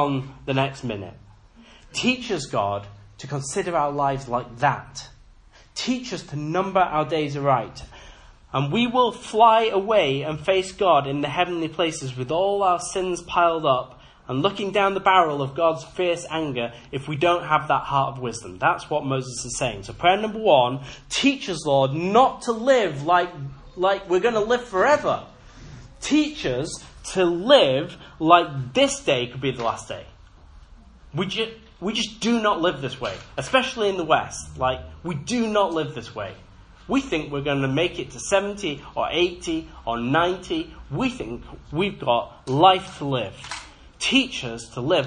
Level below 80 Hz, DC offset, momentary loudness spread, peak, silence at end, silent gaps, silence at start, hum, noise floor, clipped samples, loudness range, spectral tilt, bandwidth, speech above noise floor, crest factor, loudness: -50 dBFS; under 0.1%; 14 LU; 0 dBFS; 0 s; none; 0 s; none; -51 dBFS; under 0.1%; 6 LU; -4.5 dB/octave; 10.5 kHz; 28 dB; 24 dB; -23 LUFS